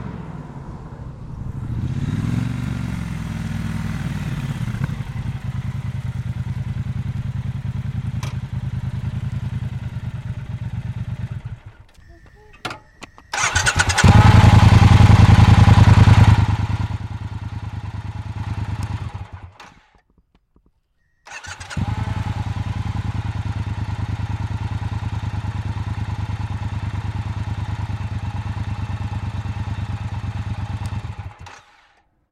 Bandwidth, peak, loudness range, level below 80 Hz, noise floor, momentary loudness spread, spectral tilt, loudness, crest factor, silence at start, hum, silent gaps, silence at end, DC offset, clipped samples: 10.5 kHz; -2 dBFS; 18 LU; -30 dBFS; -64 dBFS; 21 LU; -6 dB/octave; -20 LUFS; 16 dB; 0 s; none; none; 0.8 s; under 0.1%; under 0.1%